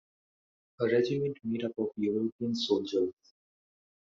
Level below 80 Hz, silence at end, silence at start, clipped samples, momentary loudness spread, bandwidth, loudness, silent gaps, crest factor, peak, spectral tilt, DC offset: -74 dBFS; 0.95 s; 0.8 s; under 0.1%; 6 LU; 7.6 kHz; -31 LUFS; 2.32-2.39 s; 18 dB; -14 dBFS; -5 dB/octave; under 0.1%